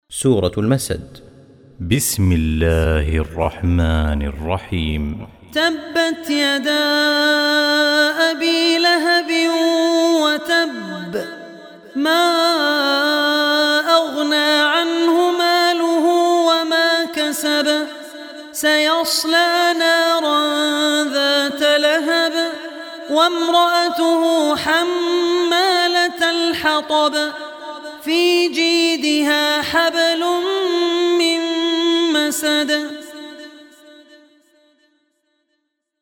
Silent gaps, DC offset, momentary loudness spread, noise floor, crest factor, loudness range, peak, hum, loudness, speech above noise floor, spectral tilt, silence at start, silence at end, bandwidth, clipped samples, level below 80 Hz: none; under 0.1%; 10 LU; -72 dBFS; 16 dB; 4 LU; 0 dBFS; none; -16 LUFS; 55 dB; -4 dB/octave; 0.1 s; 2.4 s; 18.5 kHz; under 0.1%; -34 dBFS